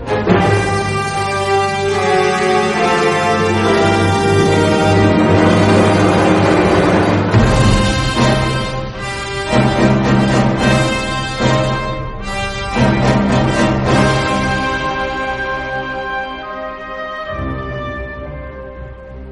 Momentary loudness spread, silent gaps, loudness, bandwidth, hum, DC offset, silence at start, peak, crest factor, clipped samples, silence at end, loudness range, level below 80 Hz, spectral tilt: 12 LU; none; -14 LUFS; 11.5 kHz; none; under 0.1%; 0 s; 0 dBFS; 14 dB; under 0.1%; 0 s; 9 LU; -30 dBFS; -6 dB/octave